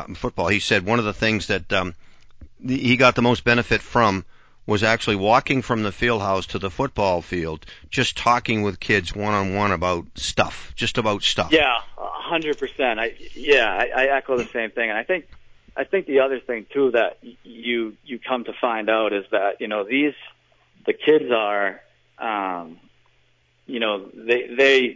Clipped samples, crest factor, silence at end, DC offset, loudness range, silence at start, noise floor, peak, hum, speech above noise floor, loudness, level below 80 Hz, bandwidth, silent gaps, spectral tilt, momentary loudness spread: under 0.1%; 18 dB; 0 s; under 0.1%; 4 LU; 0 s; -61 dBFS; -4 dBFS; none; 40 dB; -21 LUFS; -46 dBFS; 8 kHz; none; -5 dB/octave; 11 LU